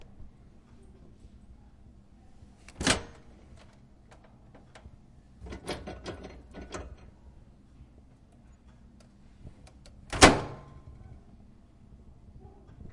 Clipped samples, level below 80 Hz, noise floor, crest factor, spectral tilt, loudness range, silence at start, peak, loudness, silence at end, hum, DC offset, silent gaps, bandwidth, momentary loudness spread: under 0.1%; -48 dBFS; -56 dBFS; 34 dB; -3 dB/octave; 19 LU; 0 s; 0 dBFS; -27 LUFS; 0.05 s; none; under 0.1%; none; 11.5 kHz; 34 LU